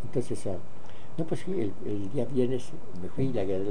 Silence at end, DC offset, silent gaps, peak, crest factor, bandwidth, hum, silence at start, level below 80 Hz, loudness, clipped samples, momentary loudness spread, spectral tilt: 0 s; 6%; none; -14 dBFS; 18 dB; 10 kHz; none; 0 s; -56 dBFS; -33 LUFS; under 0.1%; 13 LU; -7.5 dB/octave